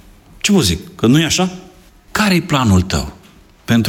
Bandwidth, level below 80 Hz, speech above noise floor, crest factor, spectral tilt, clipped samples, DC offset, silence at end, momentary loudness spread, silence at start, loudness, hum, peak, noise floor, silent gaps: 17.5 kHz; -36 dBFS; 31 dB; 14 dB; -4.5 dB/octave; under 0.1%; under 0.1%; 0 s; 11 LU; 0.45 s; -15 LUFS; none; -2 dBFS; -45 dBFS; none